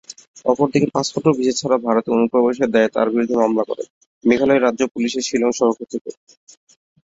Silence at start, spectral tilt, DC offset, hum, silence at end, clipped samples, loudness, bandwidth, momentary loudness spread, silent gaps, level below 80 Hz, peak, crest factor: 0.1 s; -5 dB/octave; under 0.1%; none; 0.95 s; under 0.1%; -18 LUFS; 7.8 kHz; 11 LU; 0.28-0.34 s, 3.90-4.21 s, 4.91-4.95 s, 6.01-6.05 s; -58 dBFS; -2 dBFS; 18 dB